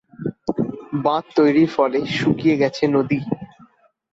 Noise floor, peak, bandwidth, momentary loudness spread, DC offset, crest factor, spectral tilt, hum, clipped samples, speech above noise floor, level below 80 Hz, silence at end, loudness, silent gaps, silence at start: -53 dBFS; -4 dBFS; 7.8 kHz; 11 LU; under 0.1%; 16 dB; -7 dB/octave; none; under 0.1%; 35 dB; -56 dBFS; 0.65 s; -20 LUFS; none; 0.2 s